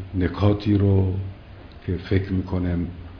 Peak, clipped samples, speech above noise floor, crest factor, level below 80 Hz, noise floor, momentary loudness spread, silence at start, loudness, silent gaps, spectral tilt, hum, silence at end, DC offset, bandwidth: -6 dBFS; under 0.1%; 20 dB; 18 dB; -40 dBFS; -42 dBFS; 17 LU; 0 s; -23 LUFS; none; -10 dB/octave; none; 0 s; under 0.1%; 5.4 kHz